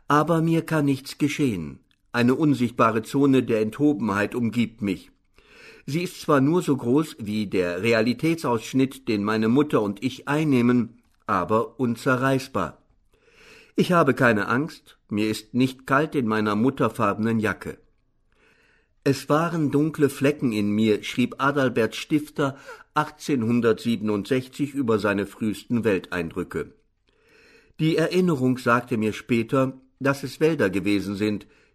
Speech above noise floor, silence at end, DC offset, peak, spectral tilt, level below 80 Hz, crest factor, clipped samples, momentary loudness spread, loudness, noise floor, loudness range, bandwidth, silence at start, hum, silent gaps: 41 dB; 0.3 s; under 0.1%; -6 dBFS; -6.5 dB/octave; -58 dBFS; 18 dB; under 0.1%; 9 LU; -23 LUFS; -64 dBFS; 3 LU; 13.5 kHz; 0.1 s; none; none